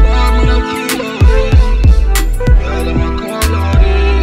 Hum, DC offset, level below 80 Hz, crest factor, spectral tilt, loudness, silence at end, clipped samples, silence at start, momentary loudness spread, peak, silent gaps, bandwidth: none; under 0.1%; -10 dBFS; 10 dB; -5.5 dB/octave; -12 LUFS; 0 s; under 0.1%; 0 s; 5 LU; 0 dBFS; none; 16 kHz